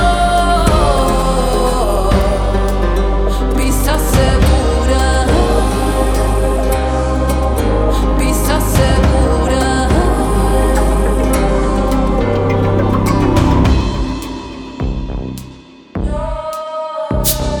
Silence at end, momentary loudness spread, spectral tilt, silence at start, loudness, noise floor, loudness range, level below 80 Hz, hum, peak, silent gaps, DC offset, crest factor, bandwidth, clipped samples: 0 s; 10 LU; -5.5 dB/octave; 0 s; -14 LUFS; -36 dBFS; 4 LU; -16 dBFS; none; 0 dBFS; none; under 0.1%; 12 dB; over 20 kHz; under 0.1%